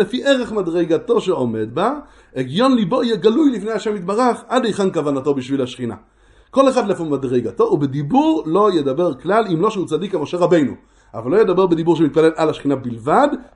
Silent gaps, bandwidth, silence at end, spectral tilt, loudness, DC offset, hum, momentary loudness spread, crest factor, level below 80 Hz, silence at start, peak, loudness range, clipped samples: none; 11 kHz; 0.1 s; -6.5 dB/octave; -17 LUFS; under 0.1%; none; 7 LU; 16 dB; -52 dBFS; 0 s; 0 dBFS; 2 LU; under 0.1%